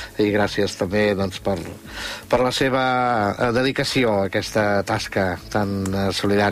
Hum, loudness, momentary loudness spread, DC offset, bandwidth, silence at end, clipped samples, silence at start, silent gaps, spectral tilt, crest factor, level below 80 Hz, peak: none; -21 LUFS; 6 LU; under 0.1%; 15.5 kHz; 0 s; under 0.1%; 0 s; none; -5 dB/octave; 14 dB; -46 dBFS; -8 dBFS